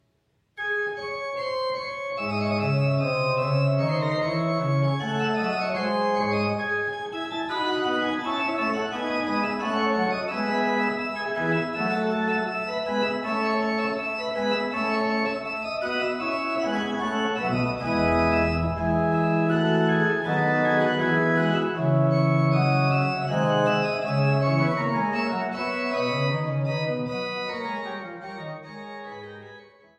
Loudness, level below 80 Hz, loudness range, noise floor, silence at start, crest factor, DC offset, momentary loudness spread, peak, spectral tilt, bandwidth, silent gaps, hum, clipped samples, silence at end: -25 LUFS; -50 dBFS; 4 LU; -69 dBFS; 0.55 s; 16 dB; under 0.1%; 8 LU; -10 dBFS; -7 dB/octave; 8.8 kHz; none; none; under 0.1%; 0.35 s